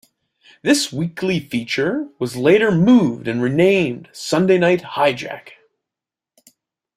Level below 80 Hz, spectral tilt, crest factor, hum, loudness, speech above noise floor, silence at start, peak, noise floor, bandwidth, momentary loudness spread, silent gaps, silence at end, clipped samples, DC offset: -56 dBFS; -5.5 dB/octave; 16 dB; none; -17 LUFS; 70 dB; 0.65 s; -2 dBFS; -87 dBFS; 15 kHz; 12 LU; none; 1.45 s; under 0.1%; under 0.1%